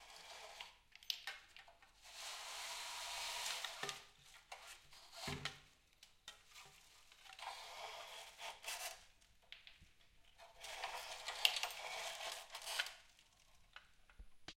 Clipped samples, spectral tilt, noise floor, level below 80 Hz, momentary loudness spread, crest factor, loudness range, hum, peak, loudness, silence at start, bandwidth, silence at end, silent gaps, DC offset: under 0.1%; 0 dB/octave; -69 dBFS; -74 dBFS; 20 LU; 40 dB; 10 LU; none; -12 dBFS; -46 LUFS; 0 s; 16.5 kHz; 0 s; none; under 0.1%